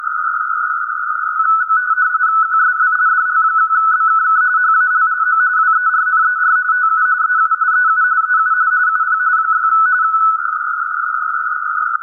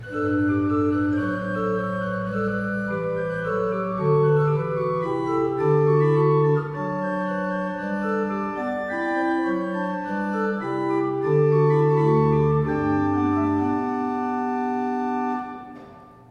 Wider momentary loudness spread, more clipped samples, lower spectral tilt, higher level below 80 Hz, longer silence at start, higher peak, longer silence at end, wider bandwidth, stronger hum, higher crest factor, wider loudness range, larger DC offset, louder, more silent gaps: about the same, 6 LU vs 8 LU; neither; second, -1.5 dB/octave vs -9.5 dB/octave; second, -76 dBFS vs -52 dBFS; about the same, 0 s vs 0 s; first, -4 dBFS vs -8 dBFS; second, 0 s vs 0.2 s; second, 1.8 kHz vs 6.6 kHz; first, 50 Hz at -75 dBFS vs none; about the same, 12 dB vs 14 dB; second, 2 LU vs 5 LU; neither; first, -13 LUFS vs -23 LUFS; neither